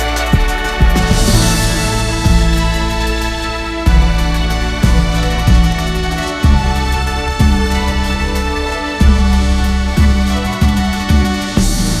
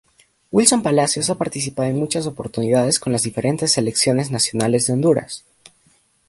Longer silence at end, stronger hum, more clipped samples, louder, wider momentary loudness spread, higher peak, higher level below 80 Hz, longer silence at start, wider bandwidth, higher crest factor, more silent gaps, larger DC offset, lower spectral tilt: second, 0 s vs 0.9 s; neither; neither; first, -14 LUFS vs -18 LUFS; second, 5 LU vs 8 LU; about the same, 0 dBFS vs 0 dBFS; first, -14 dBFS vs -56 dBFS; second, 0 s vs 0.5 s; first, 15.5 kHz vs 12.5 kHz; second, 12 dB vs 20 dB; neither; neither; about the same, -5 dB/octave vs -4 dB/octave